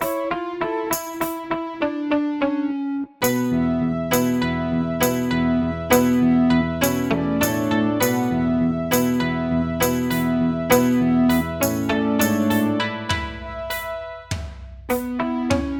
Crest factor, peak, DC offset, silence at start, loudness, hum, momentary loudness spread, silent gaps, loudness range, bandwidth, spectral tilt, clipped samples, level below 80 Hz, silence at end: 20 dB; -2 dBFS; under 0.1%; 0 s; -21 LUFS; none; 9 LU; none; 4 LU; 18 kHz; -5 dB/octave; under 0.1%; -44 dBFS; 0 s